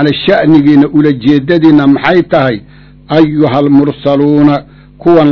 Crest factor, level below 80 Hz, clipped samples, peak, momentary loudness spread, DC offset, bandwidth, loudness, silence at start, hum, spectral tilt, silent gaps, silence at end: 8 dB; -40 dBFS; 5%; 0 dBFS; 6 LU; 0.3%; 6 kHz; -8 LUFS; 0 s; none; -9 dB/octave; none; 0 s